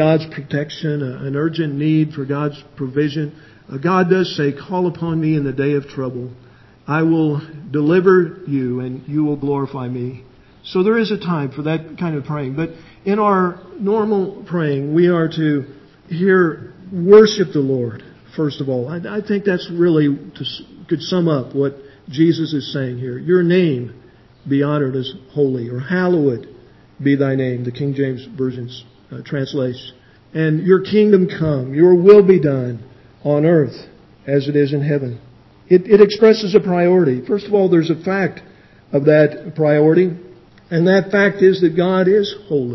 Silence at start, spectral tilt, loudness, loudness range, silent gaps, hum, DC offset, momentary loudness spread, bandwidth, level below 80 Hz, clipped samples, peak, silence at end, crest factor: 0 s; -8 dB/octave; -17 LUFS; 7 LU; none; none; under 0.1%; 14 LU; 6 kHz; -54 dBFS; under 0.1%; 0 dBFS; 0 s; 16 dB